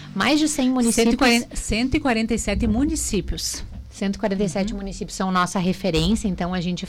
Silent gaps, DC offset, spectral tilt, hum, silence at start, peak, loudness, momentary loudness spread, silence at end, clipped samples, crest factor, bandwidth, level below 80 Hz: none; under 0.1%; -4.5 dB/octave; none; 0 s; -10 dBFS; -22 LUFS; 9 LU; 0 s; under 0.1%; 12 dB; 17 kHz; -34 dBFS